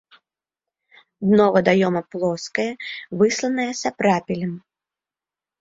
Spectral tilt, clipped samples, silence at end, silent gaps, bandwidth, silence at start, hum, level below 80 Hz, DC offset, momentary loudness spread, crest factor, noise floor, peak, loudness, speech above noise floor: -5.5 dB/octave; under 0.1%; 1 s; none; 7.8 kHz; 1.2 s; none; -62 dBFS; under 0.1%; 12 LU; 20 dB; under -90 dBFS; -4 dBFS; -21 LUFS; over 70 dB